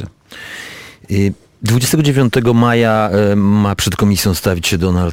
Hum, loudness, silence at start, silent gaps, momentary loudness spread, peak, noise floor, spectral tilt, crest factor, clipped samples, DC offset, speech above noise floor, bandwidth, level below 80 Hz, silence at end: none; -14 LUFS; 0 s; none; 17 LU; -2 dBFS; -33 dBFS; -5.5 dB/octave; 12 dB; under 0.1%; under 0.1%; 21 dB; 17 kHz; -36 dBFS; 0 s